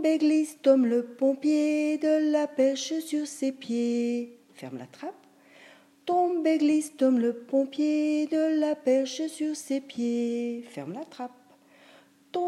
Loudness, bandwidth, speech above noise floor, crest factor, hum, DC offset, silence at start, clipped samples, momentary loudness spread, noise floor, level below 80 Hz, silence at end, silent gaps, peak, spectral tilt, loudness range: -26 LUFS; 13 kHz; 31 dB; 18 dB; none; under 0.1%; 0 s; under 0.1%; 16 LU; -57 dBFS; -88 dBFS; 0 s; none; -8 dBFS; -4.5 dB/octave; 7 LU